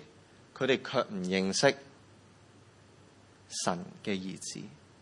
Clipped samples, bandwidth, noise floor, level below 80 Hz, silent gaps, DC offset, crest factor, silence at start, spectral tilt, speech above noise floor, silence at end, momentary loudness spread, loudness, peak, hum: under 0.1%; 11.5 kHz; -58 dBFS; -76 dBFS; none; under 0.1%; 24 dB; 0 s; -4 dB/octave; 27 dB; 0.25 s; 16 LU; -32 LUFS; -10 dBFS; none